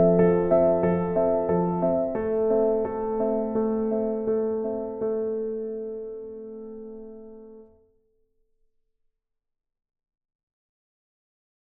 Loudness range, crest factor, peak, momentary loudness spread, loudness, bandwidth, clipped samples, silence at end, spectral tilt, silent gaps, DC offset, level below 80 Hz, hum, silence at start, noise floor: 19 LU; 20 dB; -8 dBFS; 19 LU; -25 LUFS; 3.3 kHz; under 0.1%; 4 s; -13 dB/octave; none; under 0.1%; -52 dBFS; none; 0 s; -78 dBFS